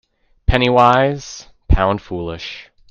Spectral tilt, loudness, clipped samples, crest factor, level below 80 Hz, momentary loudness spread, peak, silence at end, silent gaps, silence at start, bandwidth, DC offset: -6 dB/octave; -16 LUFS; under 0.1%; 16 dB; -24 dBFS; 20 LU; 0 dBFS; 0.3 s; none; 0.5 s; 7.6 kHz; under 0.1%